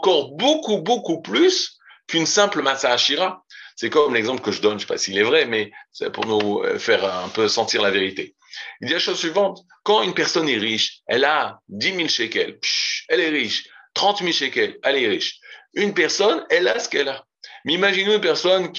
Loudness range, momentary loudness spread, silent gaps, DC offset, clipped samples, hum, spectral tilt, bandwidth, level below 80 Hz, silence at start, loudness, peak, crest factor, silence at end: 2 LU; 11 LU; none; under 0.1%; under 0.1%; none; -2.5 dB/octave; 8 kHz; -74 dBFS; 0 s; -20 LUFS; -2 dBFS; 18 dB; 0 s